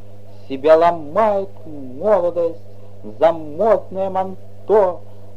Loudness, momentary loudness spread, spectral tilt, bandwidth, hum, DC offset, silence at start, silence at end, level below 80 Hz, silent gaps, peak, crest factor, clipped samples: -18 LUFS; 21 LU; -7.5 dB/octave; 7.2 kHz; none; 3%; 0.5 s; 0.35 s; -54 dBFS; none; 0 dBFS; 18 dB; under 0.1%